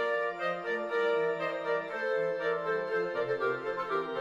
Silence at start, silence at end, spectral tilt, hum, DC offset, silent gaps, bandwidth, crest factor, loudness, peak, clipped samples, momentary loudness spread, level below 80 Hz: 0 s; 0 s; -5.5 dB/octave; none; under 0.1%; none; 7.6 kHz; 12 dB; -32 LUFS; -20 dBFS; under 0.1%; 3 LU; -76 dBFS